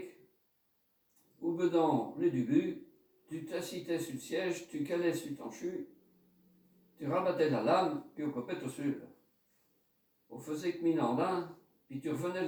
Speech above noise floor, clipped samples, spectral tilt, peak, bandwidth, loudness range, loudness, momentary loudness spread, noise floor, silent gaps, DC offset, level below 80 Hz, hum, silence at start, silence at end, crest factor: 42 dB; under 0.1%; -6 dB/octave; -16 dBFS; over 20 kHz; 4 LU; -35 LUFS; 15 LU; -76 dBFS; none; under 0.1%; -82 dBFS; none; 0 s; 0 s; 18 dB